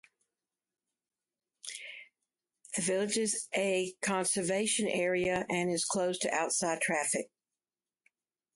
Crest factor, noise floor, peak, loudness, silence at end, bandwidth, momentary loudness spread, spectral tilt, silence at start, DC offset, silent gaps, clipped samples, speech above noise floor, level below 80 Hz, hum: 18 dB; under -90 dBFS; -16 dBFS; -31 LUFS; 1.3 s; 12 kHz; 13 LU; -3 dB/octave; 1.65 s; under 0.1%; none; under 0.1%; over 58 dB; -70 dBFS; none